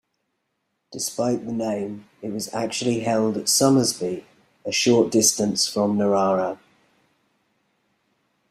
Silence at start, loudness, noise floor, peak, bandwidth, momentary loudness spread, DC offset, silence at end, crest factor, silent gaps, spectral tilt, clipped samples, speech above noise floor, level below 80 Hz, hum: 0.9 s; -21 LUFS; -75 dBFS; -4 dBFS; 15.5 kHz; 15 LU; under 0.1%; 1.95 s; 20 dB; none; -3.5 dB/octave; under 0.1%; 54 dB; -64 dBFS; none